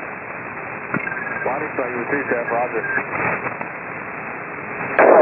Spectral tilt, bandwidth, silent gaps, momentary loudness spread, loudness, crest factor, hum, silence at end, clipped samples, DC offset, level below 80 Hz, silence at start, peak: -11 dB/octave; 3.6 kHz; none; 8 LU; -22 LUFS; 20 dB; none; 0 s; under 0.1%; under 0.1%; -60 dBFS; 0 s; 0 dBFS